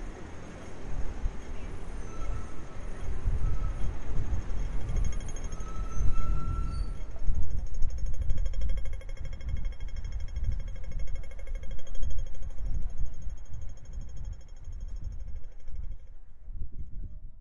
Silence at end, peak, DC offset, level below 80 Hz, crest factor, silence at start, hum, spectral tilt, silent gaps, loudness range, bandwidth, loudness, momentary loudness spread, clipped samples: 0 s; -10 dBFS; under 0.1%; -32 dBFS; 16 dB; 0 s; none; -6.5 dB/octave; none; 8 LU; 7 kHz; -39 LUFS; 11 LU; under 0.1%